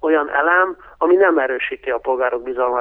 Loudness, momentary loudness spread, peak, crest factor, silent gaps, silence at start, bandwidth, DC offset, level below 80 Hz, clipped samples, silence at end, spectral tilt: -17 LUFS; 8 LU; -2 dBFS; 14 dB; none; 0.05 s; 3.7 kHz; under 0.1%; -54 dBFS; under 0.1%; 0 s; -6.5 dB/octave